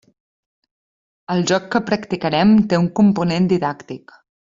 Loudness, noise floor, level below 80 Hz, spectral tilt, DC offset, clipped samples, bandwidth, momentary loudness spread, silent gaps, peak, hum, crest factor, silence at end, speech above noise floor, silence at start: -17 LUFS; under -90 dBFS; -54 dBFS; -6 dB/octave; under 0.1%; under 0.1%; 7.6 kHz; 12 LU; none; -2 dBFS; none; 16 dB; 0.55 s; over 73 dB; 1.3 s